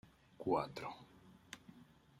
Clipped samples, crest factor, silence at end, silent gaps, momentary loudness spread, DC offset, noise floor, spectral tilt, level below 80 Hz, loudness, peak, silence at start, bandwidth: under 0.1%; 24 dB; 0.35 s; none; 24 LU; under 0.1%; -64 dBFS; -6 dB/octave; -74 dBFS; -42 LUFS; -22 dBFS; 0.05 s; 15.5 kHz